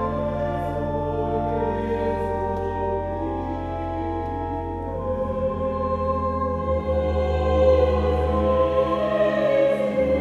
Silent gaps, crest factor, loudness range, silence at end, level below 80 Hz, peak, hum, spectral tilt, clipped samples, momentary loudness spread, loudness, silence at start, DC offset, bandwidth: none; 16 dB; 6 LU; 0 s; -36 dBFS; -6 dBFS; none; -8.5 dB/octave; under 0.1%; 8 LU; -23 LUFS; 0 s; under 0.1%; 7.2 kHz